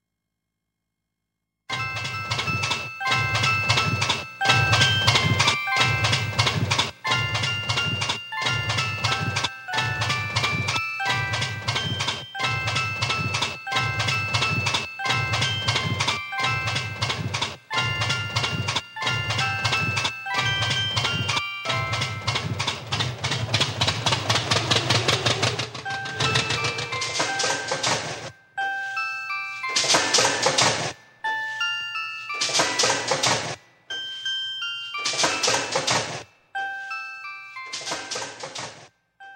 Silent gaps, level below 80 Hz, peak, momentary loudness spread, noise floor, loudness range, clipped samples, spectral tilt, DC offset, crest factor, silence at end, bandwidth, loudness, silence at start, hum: none; -52 dBFS; -4 dBFS; 10 LU; -82 dBFS; 5 LU; under 0.1%; -2.5 dB/octave; under 0.1%; 20 dB; 0 s; 16.5 kHz; -23 LUFS; 1.7 s; none